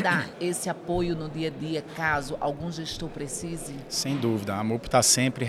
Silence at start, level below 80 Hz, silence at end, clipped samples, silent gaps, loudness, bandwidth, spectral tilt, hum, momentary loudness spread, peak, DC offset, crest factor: 0 s; -50 dBFS; 0 s; under 0.1%; none; -27 LUFS; 16.5 kHz; -3.5 dB/octave; none; 12 LU; -6 dBFS; under 0.1%; 22 dB